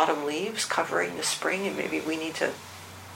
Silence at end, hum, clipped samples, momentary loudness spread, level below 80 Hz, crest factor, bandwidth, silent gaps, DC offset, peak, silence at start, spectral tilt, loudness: 0 s; none; under 0.1%; 8 LU; -70 dBFS; 22 dB; 16.5 kHz; none; under 0.1%; -8 dBFS; 0 s; -2.5 dB/octave; -28 LUFS